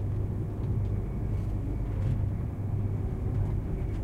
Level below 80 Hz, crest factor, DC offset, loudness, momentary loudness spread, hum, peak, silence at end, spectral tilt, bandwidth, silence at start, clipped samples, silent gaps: -34 dBFS; 12 dB; under 0.1%; -32 LUFS; 3 LU; none; -18 dBFS; 0 s; -10 dB/octave; 3.6 kHz; 0 s; under 0.1%; none